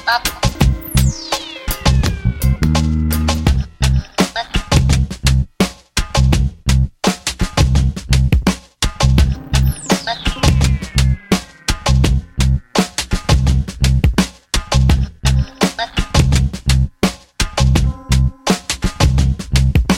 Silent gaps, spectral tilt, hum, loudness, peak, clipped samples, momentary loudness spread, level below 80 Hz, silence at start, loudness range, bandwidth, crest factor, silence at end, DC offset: none; -5 dB/octave; none; -16 LUFS; 0 dBFS; under 0.1%; 6 LU; -18 dBFS; 0 s; 1 LU; 16.5 kHz; 14 dB; 0 s; under 0.1%